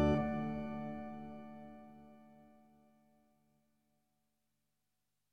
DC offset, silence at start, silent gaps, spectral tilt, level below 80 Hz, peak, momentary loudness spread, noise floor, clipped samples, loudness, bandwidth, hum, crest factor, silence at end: under 0.1%; 0 s; none; -8.5 dB/octave; -56 dBFS; -22 dBFS; 24 LU; -88 dBFS; under 0.1%; -41 LUFS; 7 kHz; 50 Hz at -85 dBFS; 22 dB; 2.8 s